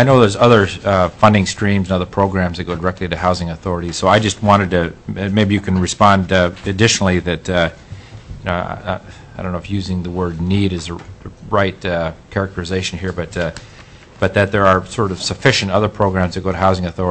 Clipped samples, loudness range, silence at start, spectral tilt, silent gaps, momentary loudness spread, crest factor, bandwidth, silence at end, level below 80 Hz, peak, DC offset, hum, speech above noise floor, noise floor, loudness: under 0.1%; 7 LU; 0 s; -5.5 dB/octave; none; 12 LU; 16 dB; 8.6 kHz; 0 s; -38 dBFS; 0 dBFS; under 0.1%; none; 24 dB; -40 dBFS; -16 LUFS